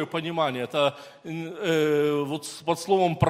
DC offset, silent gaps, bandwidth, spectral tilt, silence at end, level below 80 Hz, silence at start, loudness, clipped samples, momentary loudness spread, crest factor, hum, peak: under 0.1%; none; 16 kHz; -5.5 dB/octave; 0 s; -56 dBFS; 0 s; -26 LUFS; under 0.1%; 12 LU; 20 dB; none; -6 dBFS